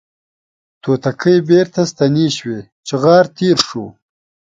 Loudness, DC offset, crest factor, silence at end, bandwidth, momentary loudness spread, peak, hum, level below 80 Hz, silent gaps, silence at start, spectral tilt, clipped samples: -14 LUFS; under 0.1%; 16 dB; 0.65 s; 9.4 kHz; 15 LU; 0 dBFS; none; -56 dBFS; 2.72-2.83 s; 0.85 s; -5.5 dB/octave; under 0.1%